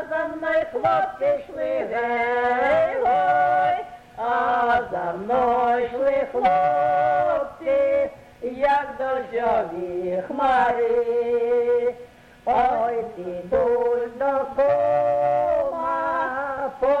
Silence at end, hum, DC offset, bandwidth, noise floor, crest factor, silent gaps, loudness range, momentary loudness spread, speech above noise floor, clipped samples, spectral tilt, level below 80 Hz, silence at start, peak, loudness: 0 s; none; under 0.1%; 8.8 kHz; -45 dBFS; 14 dB; none; 2 LU; 8 LU; 24 dB; under 0.1%; -6.5 dB/octave; -52 dBFS; 0 s; -8 dBFS; -22 LUFS